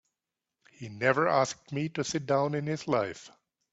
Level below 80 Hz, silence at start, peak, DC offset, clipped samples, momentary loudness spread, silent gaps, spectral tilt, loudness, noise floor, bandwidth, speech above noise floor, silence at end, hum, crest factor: -70 dBFS; 0.8 s; -8 dBFS; under 0.1%; under 0.1%; 14 LU; none; -5 dB/octave; -29 LUFS; -88 dBFS; 8.2 kHz; 59 dB; 0.45 s; none; 22 dB